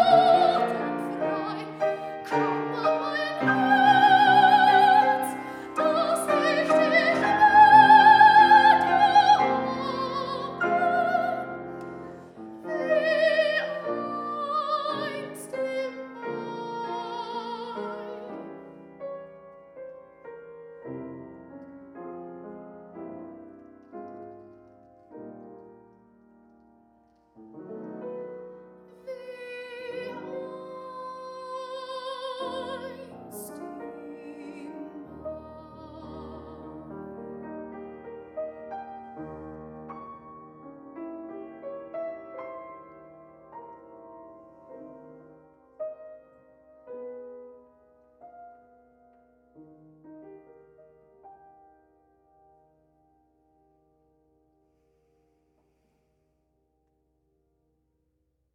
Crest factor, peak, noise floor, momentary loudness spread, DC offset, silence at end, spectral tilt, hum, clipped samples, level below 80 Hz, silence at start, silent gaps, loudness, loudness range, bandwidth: 22 dB; -4 dBFS; -74 dBFS; 27 LU; under 0.1%; 7.25 s; -4.5 dB/octave; none; under 0.1%; -68 dBFS; 0 s; none; -22 LUFS; 27 LU; 13.5 kHz